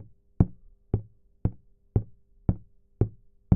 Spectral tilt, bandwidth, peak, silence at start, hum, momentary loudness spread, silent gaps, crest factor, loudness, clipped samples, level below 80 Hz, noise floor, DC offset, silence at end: -14 dB/octave; 2.4 kHz; -4 dBFS; 0 s; none; 6 LU; none; 26 dB; -31 LUFS; under 0.1%; -40 dBFS; -44 dBFS; under 0.1%; 0 s